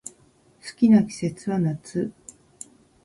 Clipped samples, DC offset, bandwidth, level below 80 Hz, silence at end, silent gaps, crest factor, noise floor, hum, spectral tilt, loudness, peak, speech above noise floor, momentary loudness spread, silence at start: under 0.1%; under 0.1%; 11.5 kHz; -62 dBFS; 0.95 s; none; 18 dB; -58 dBFS; none; -7 dB/octave; -23 LUFS; -8 dBFS; 36 dB; 25 LU; 0.65 s